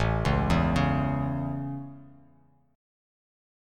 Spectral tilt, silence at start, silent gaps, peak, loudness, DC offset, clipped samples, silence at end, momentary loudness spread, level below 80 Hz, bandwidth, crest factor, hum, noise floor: -7.5 dB/octave; 0 s; none; -10 dBFS; -27 LUFS; under 0.1%; under 0.1%; 1.7 s; 13 LU; -38 dBFS; 11.5 kHz; 18 dB; none; -61 dBFS